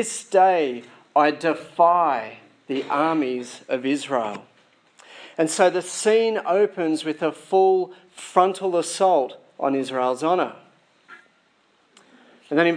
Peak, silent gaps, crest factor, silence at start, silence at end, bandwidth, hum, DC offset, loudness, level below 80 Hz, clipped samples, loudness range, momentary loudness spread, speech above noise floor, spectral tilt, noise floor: -2 dBFS; none; 20 dB; 0 s; 0 s; 10.5 kHz; none; under 0.1%; -22 LUFS; -84 dBFS; under 0.1%; 5 LU; 11 LU; 41 dB; -4 dB/octave; -62 dBFS